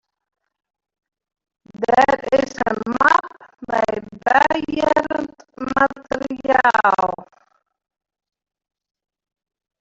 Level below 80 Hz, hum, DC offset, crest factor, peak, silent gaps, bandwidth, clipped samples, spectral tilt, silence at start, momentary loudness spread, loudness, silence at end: -54 dBFS; none; under 0.1%; 20 dB; -2 dBFS; none; 8 kHz; under 0.1%; -4.5 dB/octave; 1.75 s; 11 LU; -18 LUFS; 2.55 s